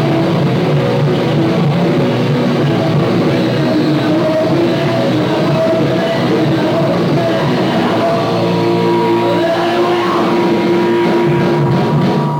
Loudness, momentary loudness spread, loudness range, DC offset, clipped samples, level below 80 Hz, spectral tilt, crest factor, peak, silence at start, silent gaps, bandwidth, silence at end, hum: -13 LUFS; 1 LU; 1 LU; under 0.1%; under 0.1%; -46 dBFS; -7.5 dB/octave; 10 dB; -2 dBFS; 0 s; none; 16.5 kHz; 0 s; none